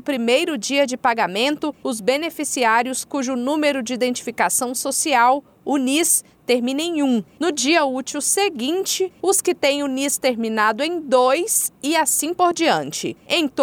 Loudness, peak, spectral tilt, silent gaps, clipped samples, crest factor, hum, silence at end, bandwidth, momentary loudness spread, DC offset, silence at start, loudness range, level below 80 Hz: -19 LUFS; -6 dBFS; -1.5 dB/octave; none; under 0.1%; 14 dB; none; 0 s; 19 kHz; 6 LU; under 0.1%; 0.05 s; 2 LU; -68 dBFS